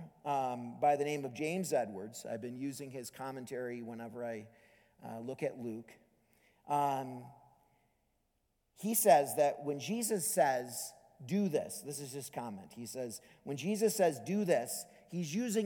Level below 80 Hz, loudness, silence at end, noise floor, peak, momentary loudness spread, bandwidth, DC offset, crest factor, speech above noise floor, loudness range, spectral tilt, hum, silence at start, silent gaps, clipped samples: -82 dBFS; -36 LUFS; 0 s; -79 dBFS; -12 dBFS; 15 LU; 19 kHz; under 0.1%; 24 dB; 44 dB; 11 LU; -4.5 dB/octave; none; 0 s; none; under 0.1%